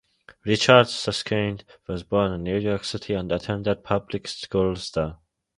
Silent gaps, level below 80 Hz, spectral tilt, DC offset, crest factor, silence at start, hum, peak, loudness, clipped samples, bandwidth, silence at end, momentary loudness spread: none; -48 dBFS; -5 dB/octave; under 0.1%; 24 dB; 0.45 s; none; 0 dBFS; -24 LUFS; under 0.1%; 11.5 kHz; 0.4 s; 15 LU